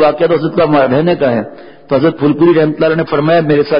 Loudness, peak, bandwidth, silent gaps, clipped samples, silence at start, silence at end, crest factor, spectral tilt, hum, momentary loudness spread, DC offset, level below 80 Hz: -11 LUFS; 0 dBFS; 5.4 kHz; none; under 0.1%; 0 s; 0 s; 10 dB; -12.5 dB/octave; none; 5 LU; 1%; -48 dBFS